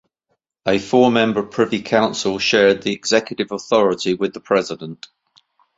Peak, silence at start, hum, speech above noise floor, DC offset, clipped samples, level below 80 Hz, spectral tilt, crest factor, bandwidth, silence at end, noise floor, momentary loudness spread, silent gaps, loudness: -2 dBFS; 0.65 s; none; 54 dB; under 0.1%; under 0.1%; -56 dBFS; -4 dB/octave; 18 dB; 8 kHz; 0.85 s; -72 dBFS; 11 LU; none; -18 LUFS